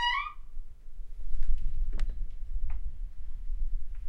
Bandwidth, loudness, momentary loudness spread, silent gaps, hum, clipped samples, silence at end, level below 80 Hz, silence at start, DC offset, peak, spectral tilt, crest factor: 5.2 kHz; -39 LUFS; 14 LU; none; none; under 0.1%; 0 s; -30 dBFS; 0 s; under 0.1%; -12 dBFS; -3.5 dB/octave; 14 dB